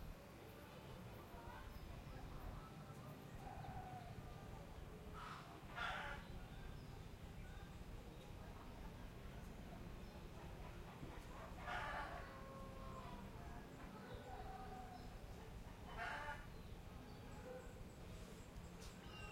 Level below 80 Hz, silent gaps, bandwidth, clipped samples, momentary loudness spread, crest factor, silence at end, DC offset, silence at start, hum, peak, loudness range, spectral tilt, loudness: -60 dBFS; none; 16 kHz; under 0.1%; 8 LU; 18 dB; 0 s; under 0.1%; 0 s; none; -34 dBFS; 4 LU; -5.5 dB/octave; -55 LUFS